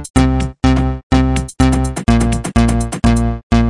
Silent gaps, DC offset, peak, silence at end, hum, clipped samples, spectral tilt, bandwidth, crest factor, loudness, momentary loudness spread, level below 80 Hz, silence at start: 0.10-0.14 s, 1.03-1.10 s, 3.43-3.50 s; under 0.1%; 0 dBFS; 0 s; none; under 0.1%; -6.5 dB/octave; 11.5 kHz; 12 dB; -15 LUFS; 2 LU; -18 dBFS; 0 s